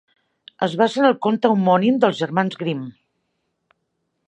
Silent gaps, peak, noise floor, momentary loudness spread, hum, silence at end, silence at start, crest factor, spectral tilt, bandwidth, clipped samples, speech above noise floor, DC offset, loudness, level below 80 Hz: none; -2 dBFS; -73 dBFS; 10 LU; none; 1.35 s; 0.6 s; 20 dB; -7 dB/octave; 9.6 kHz; under 0.1%; 55 dB; under 0.1%; -19 LUFS; -72 dBFS